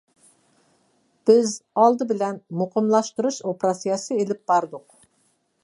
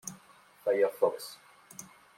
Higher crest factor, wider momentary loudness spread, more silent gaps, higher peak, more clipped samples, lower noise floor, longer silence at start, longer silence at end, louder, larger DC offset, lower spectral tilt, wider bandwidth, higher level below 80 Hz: about the same, 20 dB vs 20 dB; second, 8 LU vs 20 LU; neither; first, -4 dBFS vs -14 dBFS; neither; first, -67 dBFS vs -59 dBFS; first, 1.25 s vs 0.05 s; first, 0.85 s vs 0.35 s; first, -22 LUFS vs -30 LUFS; neither; first, -5.5 dB/octave vs -3 dB/octave; second, 11.5 kHz vs 16.5 kHz; first, -78 dBFS vs -84 dBFS